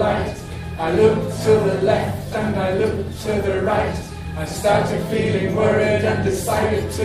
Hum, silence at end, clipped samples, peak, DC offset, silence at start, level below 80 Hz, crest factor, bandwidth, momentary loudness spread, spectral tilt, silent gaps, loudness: none; 0 s; under 0.1%; -2 dBFS; under 0.1%; 0 s; -38 dBFS; 16 dB; 15.5 kHz; 9 LU; -6 dB/octave; none; -20 LUFS